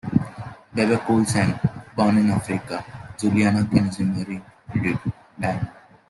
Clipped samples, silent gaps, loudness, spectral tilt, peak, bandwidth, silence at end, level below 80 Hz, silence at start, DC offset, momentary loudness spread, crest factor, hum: under 0.1%; none; -23 LUFS; -6.5 dB/octave; -4 dBFS; 12 kHz; 0.35 s; -50 dBFS; 0.05 s; under 0.1%; 13 LU; 18 dB; none